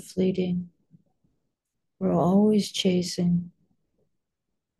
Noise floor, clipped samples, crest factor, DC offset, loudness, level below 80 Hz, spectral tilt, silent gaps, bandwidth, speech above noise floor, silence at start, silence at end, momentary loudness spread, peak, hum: -83 dBFS; under 0.1%; 16 dB; under 0.1%; -25 LUFS; -62 dBFS; -6.5 dB/octave; none; 12.5 kHz; 60 dB; 0 s; 1.3 s; 11 LU; -10 dBFS; none